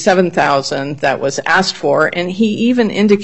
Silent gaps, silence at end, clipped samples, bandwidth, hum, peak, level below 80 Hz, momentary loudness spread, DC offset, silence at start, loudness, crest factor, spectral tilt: none; 0 s; under 0.1%; 8.4 kHz; none; 0 dBFS; -54 dBFS; 5 LU; 0.7%; 0 s; -14 LUFS; 14 dB; -5 dB/octave